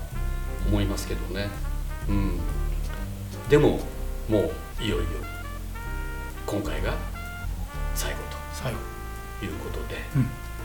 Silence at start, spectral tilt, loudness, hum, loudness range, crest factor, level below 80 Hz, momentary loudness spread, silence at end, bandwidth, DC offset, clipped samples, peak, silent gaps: 0 s; -6 dB/octave; -30 LUFS; none; 6 LU; 22 dB; -32 dBFS; 10 LU; 0 s; 19 kHz; 0.3%; under 0.1%; -6 dBFS; none